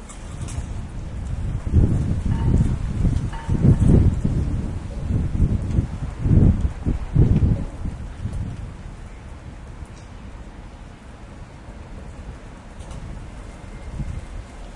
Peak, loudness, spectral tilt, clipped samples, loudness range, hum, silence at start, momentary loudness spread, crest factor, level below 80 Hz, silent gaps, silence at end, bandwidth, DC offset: -2 dBFS; -22 LUFS; -8.5 dB/octave; under 0.1%; 19 LU; none; 0 s; 22 LU; 20 dB; -28 dBFS; none; 0 s; 11 kHz; under 0.1%